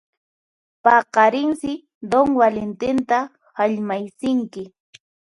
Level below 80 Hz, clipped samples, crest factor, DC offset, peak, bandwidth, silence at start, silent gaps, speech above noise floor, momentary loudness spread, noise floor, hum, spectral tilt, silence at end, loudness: -58 dBFS; under 0.1%; 20 dB; under 0.1%; -2 dBFS; 11.5 kHz; 0.85 s; 1.95-2.01 s; over 71 dB; 16 LU; under -90 dBFS; none; -5.5 dB/octave; 0.7 s; -19 LUFS